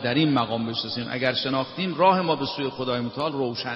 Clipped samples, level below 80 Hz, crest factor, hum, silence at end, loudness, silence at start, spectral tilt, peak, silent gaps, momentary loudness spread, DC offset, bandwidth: under 0.1%; -62 dBFS; 18 dB; none; 0 s; -24 LUFS; 0 s; -7.5 dB/octave; -6 dBFS; none; 8 LU; under 0.1%; 7.2 kHz